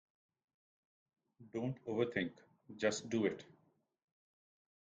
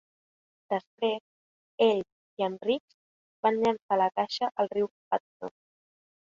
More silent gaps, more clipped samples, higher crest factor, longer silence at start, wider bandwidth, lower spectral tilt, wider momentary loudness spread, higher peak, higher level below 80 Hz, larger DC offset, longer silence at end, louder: second, none vs 0.87-0.98 s, 1.20-1.78 s, 2.12-2.37 s, 2.80-2.88 s, 2.94-3.43 s, 3.82-3.89 s, 4.91-5.11 s, 5.20-5.40 s; neither; about the same, 22 dB vs 20 dB; first, 1.4 s vs 0.7 s; first, 9 kHz vs 7.4 kHz; about the same, -5 dB/octave vs -5.5 dB/octave; second, 11 LU vs 15 LU; second, -22 dBFS vs -10 dBFS; about the same, -78 dBFS vs -74 dBFS; neither; first, 1.4 s vs 0.9 s; second, -39 LUFS vs -29 LUFS